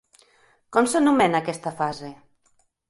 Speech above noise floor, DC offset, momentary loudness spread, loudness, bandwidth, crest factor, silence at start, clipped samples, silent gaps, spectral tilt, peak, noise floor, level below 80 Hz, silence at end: 44 dB; under 0.1%; 15 LU; -22 LUFS; 11.5 kHz; 20 dB; 0.7 s; under 0.1%; none; -4.5 dB/octave; -4 dBFS; -65 dBFS; -64 dBFS; 0.75 s